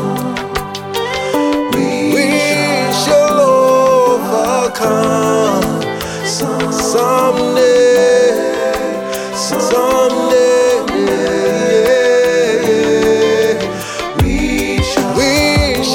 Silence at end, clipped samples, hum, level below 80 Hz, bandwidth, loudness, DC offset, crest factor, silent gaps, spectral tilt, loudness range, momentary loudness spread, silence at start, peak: 0 s; under 0.1%; none; -32 dBFS; 18.5 kHz; -13 LUFS; under 0.1%; 12 dB; none; -4 dB/octave; 2 LU; 9 LU; 0 s; 0 dBFS